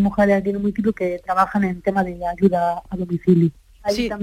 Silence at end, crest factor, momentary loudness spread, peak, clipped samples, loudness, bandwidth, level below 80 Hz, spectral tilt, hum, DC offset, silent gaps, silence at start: 0 s; 16 dB; 8 LU; -4 dBFS; under 0.1%; -20 LUFS; 14 kHz; -44 dBFS; -7.5 dB/octave; none; under 0.1%; none; 0 s